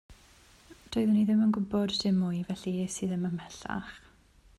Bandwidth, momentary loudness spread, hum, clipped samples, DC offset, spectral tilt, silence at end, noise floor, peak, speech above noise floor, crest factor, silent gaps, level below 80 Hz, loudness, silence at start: 12 kHz; 13 LU; none; under 0.1%; under 0.1%; -6 dB/octave; 0.6 s; -60 dBFS; -18 dBFS; 31 dB; 12 dB; none; -60 dBFS; -30 LUFS; 0.1 s